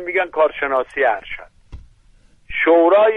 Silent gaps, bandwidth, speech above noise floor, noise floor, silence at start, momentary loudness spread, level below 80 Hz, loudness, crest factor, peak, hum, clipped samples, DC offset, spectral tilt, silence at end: none; 4 kHz; 35 dB; -51 dBFS; 0 s; 16 LU; -46 dBFS; -17 LUFS; 14 dB; -4 dBFS; none; under 0.1%; under 0.1%; -6 dB/octave; 0 s